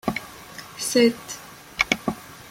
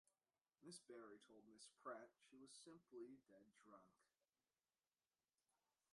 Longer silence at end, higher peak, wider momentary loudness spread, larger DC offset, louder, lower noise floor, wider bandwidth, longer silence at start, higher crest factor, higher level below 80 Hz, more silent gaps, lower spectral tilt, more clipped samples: second, 0 s vs 1.85 s; first, -2 dBFS vs -44 dBFS; first, 19 LU vs 11 LU; neither; first, -23 LUFS vs -63 LUFS; second, -41 dBFS vs under -90 dBFS; first, 16.5 kHz vs 11.5 kHz; second, 0.05 s vs 0.6 s; about the same, 24 dB vs 22 dB; first, -54 dBFS vs under -90 dBFS; neither; about the same, -3 dB/octave vs -3.5 dB/octave; neither